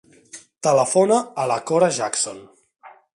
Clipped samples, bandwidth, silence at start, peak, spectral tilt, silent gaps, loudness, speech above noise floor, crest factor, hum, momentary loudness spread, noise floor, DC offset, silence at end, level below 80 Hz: under 0.1%; 11.5 kHz; 0.35 s; -4 dBFS; -4 dB/octave; none; -20 LUFS; 26 dB; 18 dB; none; 8 LU; -45 dBFS; under 0.1%; 0.25 s; -70 dBFS